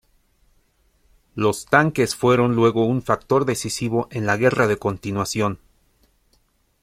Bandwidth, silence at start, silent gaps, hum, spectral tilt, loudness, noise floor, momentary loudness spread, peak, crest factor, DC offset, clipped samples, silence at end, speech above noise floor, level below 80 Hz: 16 kHz; 1.35 s; none; none; -5.5 dB/octave; -20 LUFS; -63 dBFS; 7 LU; 0 dBFS; 20 dB; under 0.1%; under 0.1%; 1.25 s; 43 dB; -52 dBFS